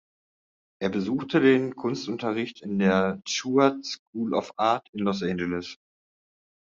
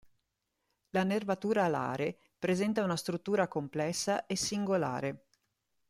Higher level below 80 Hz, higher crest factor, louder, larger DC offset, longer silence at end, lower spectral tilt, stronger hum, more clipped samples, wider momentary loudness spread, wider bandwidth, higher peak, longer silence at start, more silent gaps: about the same, -68 dBFS vs -70 dBFS; about the same, 20 dB vs 16 dB; first, -26 LUFS vs -33 LUFS; neither; first, 1 s vs 0.75 s; about the same, -5.5 dB/octave vs -5 dB/octave; neither; neither; first, 10 LU vs 7 LU; second, 7.6 kHz vs 14.5 kHz; first, -6 dBFS vs -16 dBFS; second, 0.8 s vs 0.95 s; first, 3.99-4.13 s, 4.89-4.93 s vs none